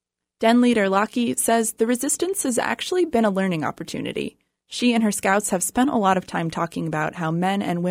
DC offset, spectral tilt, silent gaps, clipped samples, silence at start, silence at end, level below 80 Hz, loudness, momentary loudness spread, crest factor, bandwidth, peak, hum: under 0.1%; -4.5 dB/octave; none; under 0.1%; 0.4 s; 0 s; -58 dBFS; -22 LUFS; 9 LU; 18 dB; 16 kHz; -4 dBFS; none